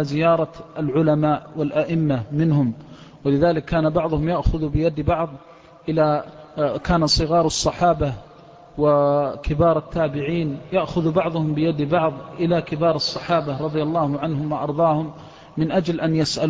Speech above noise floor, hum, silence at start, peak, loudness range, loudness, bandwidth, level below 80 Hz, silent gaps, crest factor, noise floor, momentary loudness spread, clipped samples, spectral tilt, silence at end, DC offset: 25 dB; none; 0 s; -6 dBFS; 2 LU; -21 LUFS; 8 kHz; -38 dBFS; none; 16 dB; -45 dBFS; 7 LU; under 0.1%; -6.5 dB/octave; 0 s; under 0.1%